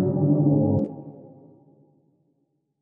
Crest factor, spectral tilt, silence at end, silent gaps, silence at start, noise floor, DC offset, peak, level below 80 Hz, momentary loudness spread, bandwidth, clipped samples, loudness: 16 dB; -15 dB/octave; 1.55 s; none; 0 s; -72 dBFS; under 0.1%; -10 dBFS; -62 dBFS; 21 LU; 1.5 kHz; under 0.1%; -22 LUFS